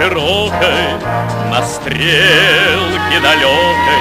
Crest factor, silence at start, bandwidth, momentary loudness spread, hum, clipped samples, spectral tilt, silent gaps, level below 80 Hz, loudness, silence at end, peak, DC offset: 12 dB; 0 s; 16 kHz; 9 LU; none; under 0.1%; -3.5 dB/octave; none; -36 dBFS; -11 LUFS; 0 s; 0 dBFS; under 0.1%